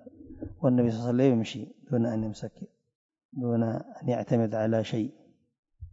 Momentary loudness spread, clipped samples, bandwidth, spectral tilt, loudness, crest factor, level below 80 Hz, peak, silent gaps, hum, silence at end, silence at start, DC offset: 18 LU; under 0.1%; 7.8 kHz; -8 dB/octave; -28 LUFS; 18 dB; -58 dBFS; -10 dBFS; 2.95-3.09 s, 3.25-3.29 s, 5.59-5.63 s; none; 0 s; 0.05 s; under 0.1%